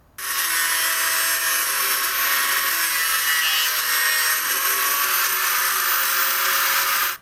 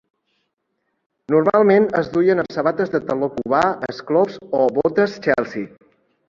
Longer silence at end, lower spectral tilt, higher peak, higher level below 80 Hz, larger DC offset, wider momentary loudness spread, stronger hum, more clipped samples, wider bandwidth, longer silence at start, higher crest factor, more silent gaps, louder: second, 0.05 s vs 0.6 s; second, 3 dB/octave vs -7.5 dB/octave; second, -6 dBFS vs -2 dBFS; about the same, -60 dBFS vs -58 dBFS; neither; second, 2 LU vs 8 LU; neither; neither; first, 18 kHz vs 7.4 kHz; second, 0.2 s vs 1.3 s; about the same, 14 dB vs 18 dB; neither; about the same, -18 LUFS vs -18 LUFS